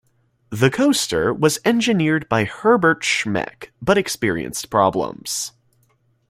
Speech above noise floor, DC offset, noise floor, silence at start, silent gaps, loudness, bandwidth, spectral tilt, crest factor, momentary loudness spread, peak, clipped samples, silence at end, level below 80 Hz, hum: 43 dB; under 0.1%; -62 dBFS; 0.5 s; none; -19 LUFS; 16 kHz; -4.5 dB/octave; 18 dB; 9 LU; -2 dBFS; under 0.1%; 0.8 s; -52 dBFS; none